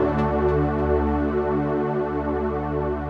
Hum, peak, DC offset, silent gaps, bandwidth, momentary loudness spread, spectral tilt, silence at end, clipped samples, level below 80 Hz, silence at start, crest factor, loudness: none; -10 dBFS; under 0.1%; none; 6 kHz; 4 LU; -10 dB/octave; 0 s; under 0.1%; -32 dBFS; 0 s; 12 dB; -23 LUFS